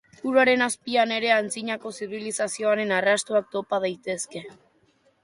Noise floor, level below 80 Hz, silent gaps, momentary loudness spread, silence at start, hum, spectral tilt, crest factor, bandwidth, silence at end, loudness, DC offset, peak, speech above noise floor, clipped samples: -64 dBFS; -72 dBFS; none; 11 LU; 0.25 s; none; -3 dB/octave; 18 dB; 11.5 kHz; 0.7 s; -24 LUFS; under 0.1%; -6 dBFS; 39 dB; under 0.1%